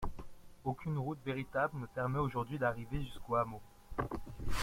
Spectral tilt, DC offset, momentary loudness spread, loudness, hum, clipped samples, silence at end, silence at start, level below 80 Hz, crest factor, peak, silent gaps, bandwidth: -6.5 dB/octave; under 0.1%; 9 LU; -39 LUFS; none; under 0.1%; 0 s; 0 s; -48 dBFS; 18 dB; -20 dBFS; none; 16.5 kHz